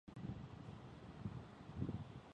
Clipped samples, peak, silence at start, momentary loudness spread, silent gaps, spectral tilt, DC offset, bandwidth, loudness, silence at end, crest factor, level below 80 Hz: under 0.1%; -30 dBFS; 0.05 s; 8 LU; none; -8 dB/octave; under 0.1%; 9.6 kHz; -51 LUFS; 0 s; 20 dB; -62 dBFS